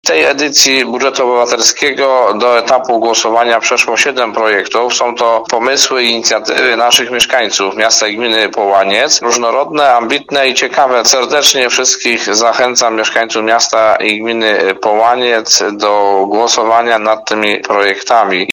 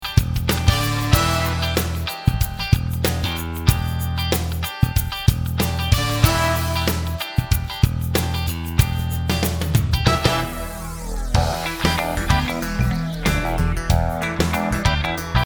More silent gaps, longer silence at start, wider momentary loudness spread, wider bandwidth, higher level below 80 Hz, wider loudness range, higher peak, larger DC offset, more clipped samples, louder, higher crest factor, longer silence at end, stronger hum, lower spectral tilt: neither; about the same, 0.05 s vs 0 s; about the same, 4 LU vs 6 LU; about the same, over 20 kHz vs over 20 kHz; second, -56 dBFS vs -26 dBFS; about the same, 1 LU vs 1 LU; about the same, 0 dBFS vs 0 dBFS; neither; first, 0.3% vs under 0.1%; first, -10 LUFS vs -21 LUFS; second, 10 dB vs 20 dB; about the same, 0 s vs 0 s; neither; second, -0.5 dB/octave vs -5 dB/octave